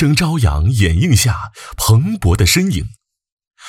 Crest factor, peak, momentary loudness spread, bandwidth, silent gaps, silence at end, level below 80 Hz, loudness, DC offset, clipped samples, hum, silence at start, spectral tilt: 12 dB; -2 dBFS; 11 LU; 16.5 kHz; 3.32-3.37 s, 3.47-3.51 s; 0 s; -26 dBFS; -14 LUFS; under 0.1%; under 0.1%; none; 0 s; -4.5 dB/octave